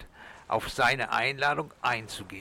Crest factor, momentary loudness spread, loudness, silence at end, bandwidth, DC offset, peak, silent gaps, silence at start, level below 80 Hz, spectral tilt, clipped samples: 16 dB; 14 LU; -28 LUFS; 0 s; 19 kHz; under 0.1%; -14 dBFS; none; 0 s; -54 dBFS; -3.5 dB/octave; under 0.1%